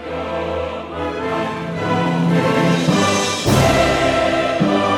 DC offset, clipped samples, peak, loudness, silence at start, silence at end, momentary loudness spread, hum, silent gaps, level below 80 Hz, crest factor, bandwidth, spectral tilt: under 0.1%; under 0.1%; -2 dBFS; -17 LUFS; 0 s; 0 s; 9 LU; none; none; -38 dBFS; 14 dB; 19.5 kHz; -5 dB/octave